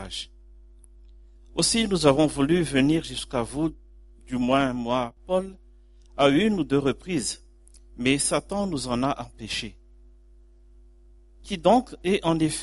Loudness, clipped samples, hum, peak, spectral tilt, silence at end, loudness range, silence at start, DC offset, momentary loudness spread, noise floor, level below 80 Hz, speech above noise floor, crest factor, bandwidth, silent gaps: -24 LUFS; under 0.1%; none; -2 dBFS; -4.5 dB/octave; 0 s; 4 LU; 0 s; under 0.1%; 13 LU; -53 dBFS; -46 dBFS; 29 dB; 22 dB; 11.5 kHz; none